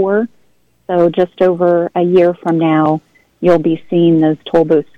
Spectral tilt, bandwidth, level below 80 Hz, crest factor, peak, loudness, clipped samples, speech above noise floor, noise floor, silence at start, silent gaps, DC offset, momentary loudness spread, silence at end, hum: -9 dB/octave; 5.6 kHz; -52 dBFS; 12 dB; -2 dBFS; -13 LUFS; under 0.1%; 45 dB; -57 dBFS; 0 s; none; under 0.1%; 6 LU; 0.15 s; none